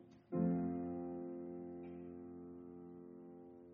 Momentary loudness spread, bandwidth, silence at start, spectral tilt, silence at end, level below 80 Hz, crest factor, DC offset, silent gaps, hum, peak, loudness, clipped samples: 18 LU; 2.9 kHz; 0 s; -11.5 dB/octave; 0 s; -74 dBFS; 20 dB; under 0.1%; none; none; -24 dBFS; -45 LUFS; under 0.1%